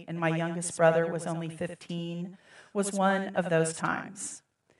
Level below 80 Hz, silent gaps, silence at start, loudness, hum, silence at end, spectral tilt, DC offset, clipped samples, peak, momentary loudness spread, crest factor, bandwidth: -78 dBFS; none; 0 s; -30 LUFS; none; 0.4 s; -5 dB/octave; under 0.1%; under 0.1%; -10 dBFS; 14 LU; 22 dB; 12 kHz